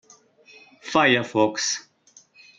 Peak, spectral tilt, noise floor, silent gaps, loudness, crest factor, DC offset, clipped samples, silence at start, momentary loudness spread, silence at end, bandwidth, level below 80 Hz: -6 dBFS; -3 dB/octave; -56 dBFS; none; -21 LUFS; 20 dB; under 0.1%; under 0.1%; 0.85 s; 11 LU; 0.8 s; 9.4 kHz; -68 dBFS